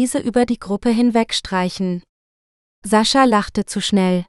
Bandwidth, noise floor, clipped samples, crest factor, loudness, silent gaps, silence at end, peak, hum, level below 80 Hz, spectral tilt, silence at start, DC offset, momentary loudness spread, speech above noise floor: 13 kHz; under -90 dBFS; under 0.1%; 18 dB; -18 LUFS; 2.09-2.82 s; 0.05 s; 0 dBFS; none; -46 dBFS; -4.5 dB/octave; 0 s; under 0.1%; 10 LU; over 73 dB